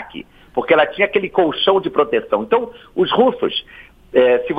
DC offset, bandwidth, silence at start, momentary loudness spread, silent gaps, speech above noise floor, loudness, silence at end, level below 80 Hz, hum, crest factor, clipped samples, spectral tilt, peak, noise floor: under 0.1%; 5 kHz; 0 s; 11 LU; none; 20 dB; -17 LUFS; 0 s; -52 dBFS; none; 16 dB; under 0.1%; -7 dB/octave; 0 dBFS; -36 dBFS